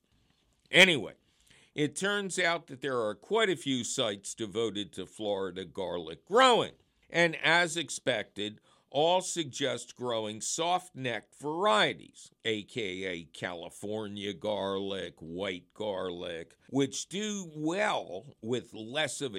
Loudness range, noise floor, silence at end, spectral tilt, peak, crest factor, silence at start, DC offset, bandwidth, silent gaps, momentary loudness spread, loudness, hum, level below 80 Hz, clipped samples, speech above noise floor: 8 LU; -70 dBFS; 0 s; -3 dB/octave; -8 dBFS; 24 dB; 0.7 s; under 0.1%; 16 kHz; none; 13 LU; -31 LUFS; none; -72 dBFS; under 0.1%; 39 dB